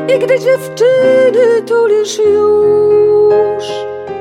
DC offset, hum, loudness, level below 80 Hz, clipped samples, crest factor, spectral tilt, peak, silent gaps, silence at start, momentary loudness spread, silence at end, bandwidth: under 0.1%; none; -10 LUFS; -54 dBFS; under 0.1%; 10 dB; -4.5 dB/octave; 0 dBFS; none; 0 s; 8 LU; 0 s; 13.5 kHz